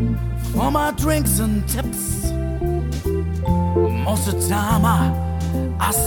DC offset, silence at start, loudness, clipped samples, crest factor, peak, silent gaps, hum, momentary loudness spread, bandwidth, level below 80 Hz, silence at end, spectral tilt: under 0.1%; 0 s; -20 LUFS; under 0.1%; 14 dB; -6 dBFS; none; none; 6 LU; 20 kHz; -28 dBFS; 0 s; -5.5 dB/octave